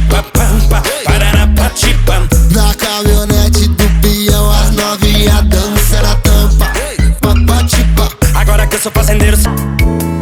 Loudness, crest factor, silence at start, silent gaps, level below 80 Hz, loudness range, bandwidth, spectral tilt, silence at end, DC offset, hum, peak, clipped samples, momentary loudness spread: -10 LUFS; 8 dB; 0 s; none; -10 dBFS; 1 LU; 18.5 kHz; -4.5 dB/octave; 0 s; under 0.1%; none; 0 dBFS; under 0.1%; 3 LU